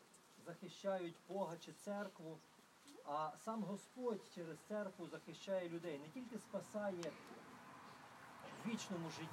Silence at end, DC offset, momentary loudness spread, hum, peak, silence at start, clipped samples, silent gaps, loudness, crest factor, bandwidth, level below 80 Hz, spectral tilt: 0 s; under 0.1%; 14 LU; none; -30 dBFS; 0 s; under 0.1%; none; -49 LUFS; 18 dB; 16 kHz; under -90 dBFS; -5 dB/octave